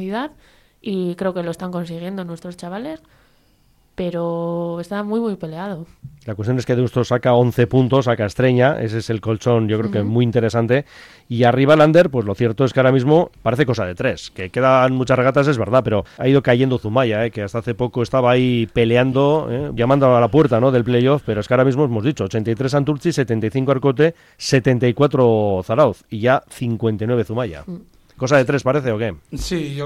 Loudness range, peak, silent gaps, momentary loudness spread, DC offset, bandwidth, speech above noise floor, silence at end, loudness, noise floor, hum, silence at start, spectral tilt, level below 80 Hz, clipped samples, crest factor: 10 LU; -2 dBFS; none; 13 LU; under 0.1%; 13 kHz; 39 dB; 0 s; -18 LUFS; -56 dBFS; none; 0 s; -7 dB/octave; -46 dBFS; under 0.1%; 16 dB